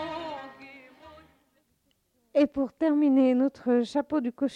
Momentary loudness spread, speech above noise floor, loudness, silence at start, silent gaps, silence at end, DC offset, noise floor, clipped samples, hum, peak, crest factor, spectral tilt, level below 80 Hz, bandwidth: 17 LU; 47 dB; -26 LUFS; 0 s; none; 0 s; under 0.1%; -72 dBFS; under 0.1%; none; -12 dBFS; 14 dB; -6 dB/octave; -66 dBFS; 9.4 kHz